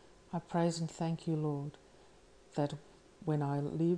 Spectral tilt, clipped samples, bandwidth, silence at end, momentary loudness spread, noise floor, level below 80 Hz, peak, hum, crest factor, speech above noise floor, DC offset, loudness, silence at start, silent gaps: -7 dB/octave; under 0.1%; 10.5 kHz; 0 s; 10 LU; -61 dBFS; -68 dBFS; -22 dBFS; none; 16 dB; 26 dB; under 0.1%; -37 LUFS; 0.3 s; none